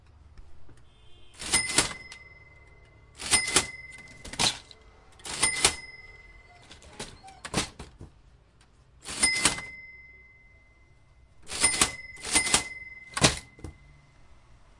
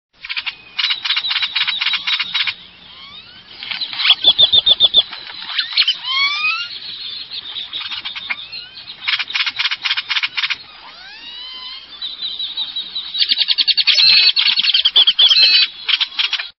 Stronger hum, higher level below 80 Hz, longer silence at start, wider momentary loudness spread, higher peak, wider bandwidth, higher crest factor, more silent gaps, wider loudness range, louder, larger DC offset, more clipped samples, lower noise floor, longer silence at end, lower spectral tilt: neither; first, -52 dBFS vs -58 dBFS; about the same, 0.25 s vs 0.25 s; first, 24 LU vs 20 LU; second, -4 dBFS vs 0 dBFS; first, 11.5 kHz vs 6.4 kHz; first, 28 dB vs 18 dB; neither; second, 5 LU vs 11 LU; second, -26 LUFS vs -13 LUFS; neither; neither; first, -59 dBFS vs -39 dBFS; first, 1.05 s vs 0.1 s; first, -1 dB/octave vs 0.5 dB/octave